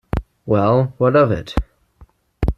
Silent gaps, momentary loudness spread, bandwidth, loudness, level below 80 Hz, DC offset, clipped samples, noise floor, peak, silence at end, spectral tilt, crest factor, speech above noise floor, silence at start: none; 12 LU; 11.5 kHz; -18 LUFS; -30 dBFS; under 0.1%; under 0.1%; -49 dBFS; -2 dBFS; 0.05 s; -8.5 dB/octave; 16 dB; 34 dB; 0.15 s